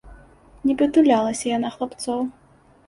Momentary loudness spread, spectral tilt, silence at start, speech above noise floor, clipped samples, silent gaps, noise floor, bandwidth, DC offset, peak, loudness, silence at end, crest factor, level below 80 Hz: 11 LU; -4.5 dB/octave; 0.05 s; 28 dB; under 0.1%; none; -49 dBFS; 11.5 kHz; under 0.1%; -4 dBFS; -21 LUFS; 0.55 s; 18 dB; -52 dBFS